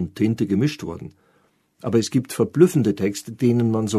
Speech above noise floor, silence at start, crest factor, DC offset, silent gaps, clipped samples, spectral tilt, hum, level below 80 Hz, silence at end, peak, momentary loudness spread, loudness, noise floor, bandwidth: 42 dB; 0 s; 20 dB; under 0.1%; none; under 0.1%; -6.5 dB/octave; none; -56 dBFS; 0 s; -2 dBFS; 16 LU; -21 LUFS; -63 dBFS; 13.5 kHz